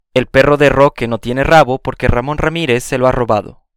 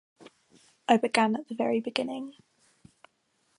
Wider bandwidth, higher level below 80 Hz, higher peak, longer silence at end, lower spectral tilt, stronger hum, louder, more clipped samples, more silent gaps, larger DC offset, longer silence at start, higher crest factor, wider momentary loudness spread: first, 17 kHz vs 11.5 kHz; first, -28 dBFS vs -80 dBFS; first, 0 dBFS vs -6 dBFS; second, 0.25 s vs 1.25 s; first, -6 dB/octave vs -4.5 dB/octave; neither; first, -13 LUFS vs -28 LUFS; first, 0.5% vs under 0.1%; neither; neither; about the same, 0.15 s vs 0.25 s; second, 12 dB vs 26 dB; second, 7 LU vs 15 LU